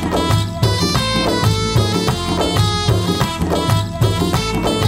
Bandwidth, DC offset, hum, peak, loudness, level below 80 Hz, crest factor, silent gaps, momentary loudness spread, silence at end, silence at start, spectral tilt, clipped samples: 16.5 kHz; under 0.1%; none; -2 dBFS; -17 LUFS; -30 dBFS; 14 dB; none; 2 LU; 0 s; 0 s; -5 dB/octave; under 0.1%